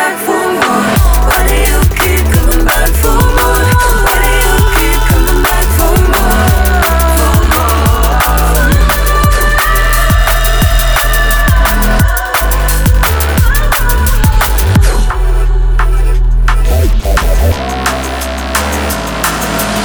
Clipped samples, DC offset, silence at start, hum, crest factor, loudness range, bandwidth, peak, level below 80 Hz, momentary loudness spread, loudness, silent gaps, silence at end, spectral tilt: under 0.1%; 0.5%; 0 s; none; 8 dB; 3 LU; over 20 kHz; 0 dBFS; -10 dBFS; 4 LU; -10 LUFS; none; 0 s; -4.5 dB/octave